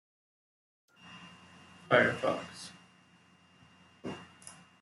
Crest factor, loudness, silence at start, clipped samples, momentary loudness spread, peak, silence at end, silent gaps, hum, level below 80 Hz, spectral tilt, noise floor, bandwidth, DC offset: 26 dB; -31 LUFS; 1.05 s; under 0.1%; 27 LU; -12 dBFS; 0.3 s; none; none; -76 dBFS; -4.5 dB/octave; -63 dBFS; 12 kHz; under 0.1%